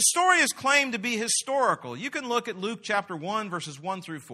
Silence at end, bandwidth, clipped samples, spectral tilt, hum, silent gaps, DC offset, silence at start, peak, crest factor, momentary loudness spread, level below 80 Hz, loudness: 0 s; 14 kHz; under 0.1%; -1.5 dB/octave; none; none; under 0.1%; 0 s; -6 dBFS; 20 dB; 13 LU; -76 dBFS; -26 LUFS